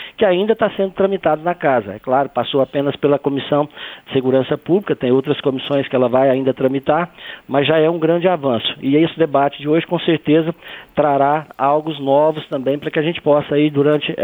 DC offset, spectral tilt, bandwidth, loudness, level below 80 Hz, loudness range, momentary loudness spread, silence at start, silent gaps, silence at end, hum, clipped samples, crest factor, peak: under 0.1%; -8.5 dB/octave; over 20 kHz; -17 LUFS; -56 dBFS; 2 LU; 5 LU; 0 s; none; 0 s; none; under 0.1%; 14 dB; -2 dBFS